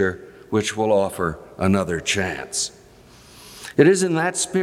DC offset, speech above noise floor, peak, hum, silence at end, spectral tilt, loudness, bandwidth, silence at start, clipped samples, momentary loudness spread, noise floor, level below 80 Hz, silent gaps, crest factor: under 0.1%; 28 dB; -2 dBFS; none; 0 s; -4.5 dB/octave; -21 LUFS; 15.5 kHz; 0 s; under 0.1%; 11 LU; -48 dBFS; -54 dBFS; none; 20 dB